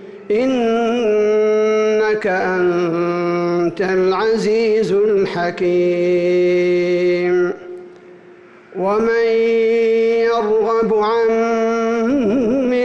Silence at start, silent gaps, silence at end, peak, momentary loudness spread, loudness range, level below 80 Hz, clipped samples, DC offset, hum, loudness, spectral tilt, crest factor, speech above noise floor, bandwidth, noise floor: 0 s; none; 0 s; -8 dBFS; 4 LU; 2 LU; -54 dBFS; under 0.1%; under 0.1%; none; -16 LUFS; -6.5 dB/octave; 8 dB; 27 dB; 8.2 kHz; -43 dBFS